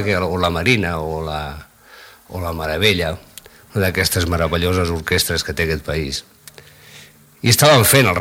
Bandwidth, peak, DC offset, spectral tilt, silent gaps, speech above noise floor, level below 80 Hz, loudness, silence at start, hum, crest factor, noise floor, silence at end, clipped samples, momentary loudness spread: 17.5 kHz; 0 dBFS; under 0.1%; -4 dB/octave; none; 27 dB; -36 dBFS; -17 LUFS; 0 s; none; 18 dB; -44 dBFS; 0 s; under 0.1%; 16 LU